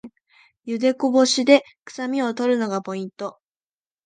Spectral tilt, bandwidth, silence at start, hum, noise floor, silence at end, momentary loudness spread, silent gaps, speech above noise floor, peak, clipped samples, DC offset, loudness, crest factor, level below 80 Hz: -3.5 dB/octave; 9.6 kHz; 0.05 s; none; under -90 dBFS; 0.75 s; 17 LU; 1.81-1.86 s; over 69 dB; -2 dBFS; under 0.1%; under 0.1%; -21 LUFS; 20 dB; -76 dBFS